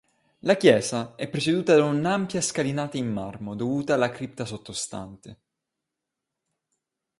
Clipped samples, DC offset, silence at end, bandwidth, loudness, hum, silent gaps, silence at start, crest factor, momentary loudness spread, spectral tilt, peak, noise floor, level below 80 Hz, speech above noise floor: under 0.1%; under 0.1%; 1.85 s; 11.5 kHz; -25 LUFS; none; none; 0.45 s; 22 dB; 14 LU; -5 dB/octave; -4 dBFS; -85 dBFS; -62 dBFS; 60 dB